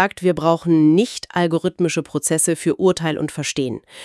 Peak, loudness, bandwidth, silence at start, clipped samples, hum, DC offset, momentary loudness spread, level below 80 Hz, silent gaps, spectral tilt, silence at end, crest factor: -2 dBFS; -19 LUFS; 12 kHz; 0 s; under 0.1%; none; under 0.1%; 8 LU; -56 dBFS; none; -5 dB/octave; 0 s; 18 dB